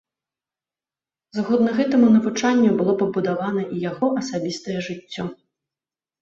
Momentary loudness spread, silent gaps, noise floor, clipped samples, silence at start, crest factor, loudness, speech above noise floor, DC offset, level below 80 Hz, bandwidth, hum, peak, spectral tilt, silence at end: 14 LU; none; under -90 dBFS; under 0.1%; 1.35 s; 16 dB; -21 LUFS; over 70 dB; under 0.1%; -62 dBFS; 7.8 kHz; none; -6 dBFS; -6 dB/octave; 0.9 s